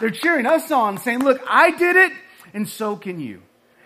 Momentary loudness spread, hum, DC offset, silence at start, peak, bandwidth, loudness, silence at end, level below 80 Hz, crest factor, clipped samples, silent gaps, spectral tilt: 18 LU; none; under 0.1%; 0 s; -2 dBFS; 15.5 kHz; -17 LUFS; 0.5 s; -70 dBFS; 18 dB; under 0.1%; none; -4.5 dB/octave